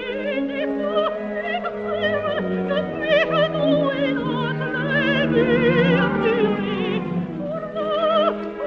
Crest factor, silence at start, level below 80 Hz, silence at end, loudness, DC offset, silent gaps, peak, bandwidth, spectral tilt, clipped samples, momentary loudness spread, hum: 16 dB; 0 s; -50 dBFS; 0 s; -21 LUFS; under 0.1%; none; -6 dBFS; 6.8 kHz; -8 dB/octave; under 0.1%; 8 LU; none